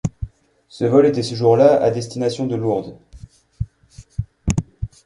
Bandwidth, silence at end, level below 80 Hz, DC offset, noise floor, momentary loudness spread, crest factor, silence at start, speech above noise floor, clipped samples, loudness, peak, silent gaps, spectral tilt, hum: 11.5 kHz; 0.2 s; -38 dBFS; under 0.1%; -45 dBFS; 19 LU; 18 dB; 0.05 s; 29 dB; under 0.1%; -18 LUFS; -2 dBFS; none; -7 dB/octave; none